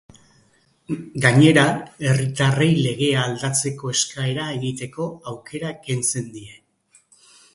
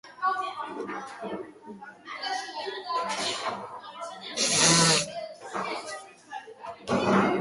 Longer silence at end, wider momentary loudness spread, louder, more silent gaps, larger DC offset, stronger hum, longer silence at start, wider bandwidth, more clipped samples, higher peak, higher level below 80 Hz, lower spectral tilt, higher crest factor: first, 1 s vs 0 s; second, 16 LU vs 22 LU; first, -20 LUFS vs -27 LUFS; neither; neither; neither; first, 0.9 s vs 0.05 s; about the same, 11.5 kHz vs 12 kHz; neither; first, 0 dBFS vs -8 dBFS; first, -58 dBFS vs -64 dBFS; first, -4.5 dB/octave vs -2.5 dB/octave; about the same, 22 dB vs 22 dB